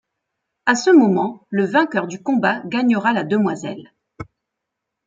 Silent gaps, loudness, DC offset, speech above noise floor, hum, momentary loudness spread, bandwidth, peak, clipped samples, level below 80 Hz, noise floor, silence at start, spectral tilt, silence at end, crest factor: none; -18 LUFS; under 0.1%; 63 dB; none; 24 LU; 7.8 kHz; -2 dBFS; under 0.1%; -62 dBFS; -80 dBFS; 0.65 s; -5.5 dB/octave; 0.85 s; 16 dB